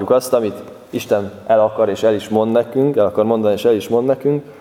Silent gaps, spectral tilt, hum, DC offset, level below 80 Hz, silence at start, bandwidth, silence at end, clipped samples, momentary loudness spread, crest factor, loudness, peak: none; -6.5 dB/octave; none; under 0.1%; -60 dBFS; 0 s; 17 kHz; 0 s; under 0.1%; 5 LU; 16 dB; -16 LUFS; 0 dBFS